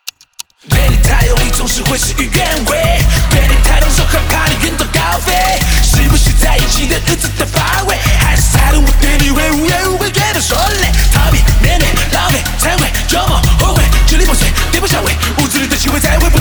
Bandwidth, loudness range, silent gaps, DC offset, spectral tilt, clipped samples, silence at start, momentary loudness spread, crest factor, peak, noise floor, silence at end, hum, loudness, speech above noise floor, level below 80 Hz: over 20 kHz; 1 LU; none; under 0.1%; -3.5 dB/octave; under 0.1%; 0.05 s; 3 LU; 10 dB; 0 dBFS; -33 dBFS; 0 s; none; -11 LUFS; 24 dB; -12 dBFS